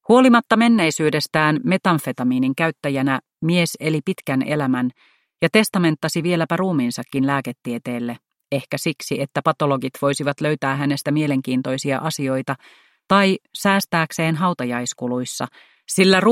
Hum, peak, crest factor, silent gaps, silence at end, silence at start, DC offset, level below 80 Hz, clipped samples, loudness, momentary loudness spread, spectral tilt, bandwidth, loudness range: none; 0 dBFS; 18 dB; none; 0 s; 0.1 s; under 0.1%; -62 dBFS; under 0.1%; -20 LUFS; 10 LU; -5 dB/octave; 16.5 kHz; 4 LU